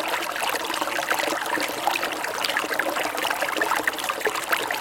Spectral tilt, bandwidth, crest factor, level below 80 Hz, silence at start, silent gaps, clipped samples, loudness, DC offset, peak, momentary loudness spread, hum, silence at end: -1 dB/octave; 17 kHz; 20 dB; -64 dBFS; 0 s; none; under 0.1%; -24 LUFS; under 0.1%; -6 dBFS; 2 LU; none; 0 s